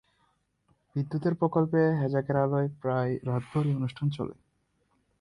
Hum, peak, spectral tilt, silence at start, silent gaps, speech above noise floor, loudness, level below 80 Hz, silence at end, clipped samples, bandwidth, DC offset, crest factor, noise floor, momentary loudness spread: none; -12 dBFS; -9.5 dB/octave; 0.95 s; none; 45 dB; -29 LUFS; -62 dBFS; 0.9 s; under 0.1%; 10 kHz; under 0.1%; 18 dB; -73 dBFS; 8 LU